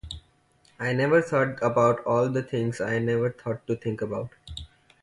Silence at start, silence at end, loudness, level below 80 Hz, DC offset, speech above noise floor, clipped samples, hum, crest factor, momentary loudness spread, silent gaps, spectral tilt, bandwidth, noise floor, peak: 0.05 s; 0.35 s; -26 LUFS; -52 dBFS; under 0.1%; 37 dB; under 0.1%; none; 18 dB; 18 LU; none; -7 dB/octave; 11.5 kHz; -62 dBFS; -8 dBFS